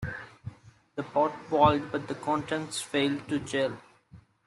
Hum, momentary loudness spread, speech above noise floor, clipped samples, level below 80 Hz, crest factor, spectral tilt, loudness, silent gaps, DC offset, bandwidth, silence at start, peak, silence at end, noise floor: none; 19 LU; 28 dB; under 0.1%; -58 dBFS; 22 dB; -5 dB/octave; -29 LUFS; none; under 0.1%; 12.5 kHz; 0 s; -8 dBFS; 0.3 s; -56 dBFS